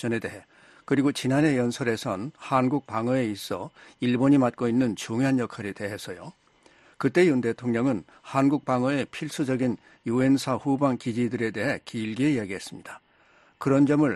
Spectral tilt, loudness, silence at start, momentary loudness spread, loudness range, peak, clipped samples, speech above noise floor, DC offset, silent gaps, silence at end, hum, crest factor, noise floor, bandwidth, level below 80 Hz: -6.5 dB/octave; -26 LUFS; 0 s; 13 LU; 1 LU; -6 dBFS; under 0.1%; 34 dB; under 0.1%; none; 0 s; none; 20 dB; -60 dBFS; 12.5 kHz; -64 dBFS